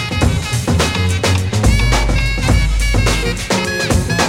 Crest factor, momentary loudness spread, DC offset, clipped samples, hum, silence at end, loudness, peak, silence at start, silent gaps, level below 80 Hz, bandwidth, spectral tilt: 14 dB; 3 LU; under 0.1%; under 0.1%; none; 0 s; -15 LUFS; 0 dBFS; 0 s; none; -18 dBFS; 16 kHz; -4.5 dB/octave